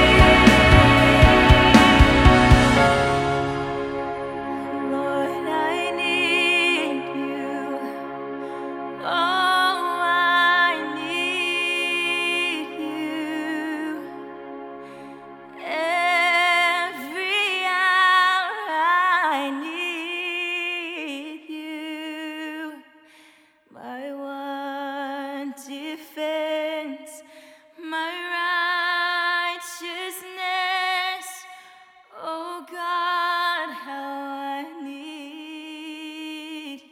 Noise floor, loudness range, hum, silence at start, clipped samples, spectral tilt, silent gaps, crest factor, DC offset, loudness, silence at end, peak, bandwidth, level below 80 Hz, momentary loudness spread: -55 dBFS; 14 LU; none; 0 s; under 0.1%; -5 dB/octave; none; 22 dB; under 0.1%; -20 LUFS; 0.1 s; 0 dBFS; 17.5 kHz; -32 dBFS; 21 LU